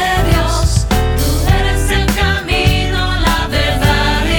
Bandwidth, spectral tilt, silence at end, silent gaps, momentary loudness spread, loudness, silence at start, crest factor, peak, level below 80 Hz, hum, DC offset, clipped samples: over 20 kHz; -4.5 dB/octave; 0 s; none; 2 LU; -14 LUFS; 0 s; 12 dB; 0 dBFS; -16 dBFS; none; under 0.1%; under 0.1%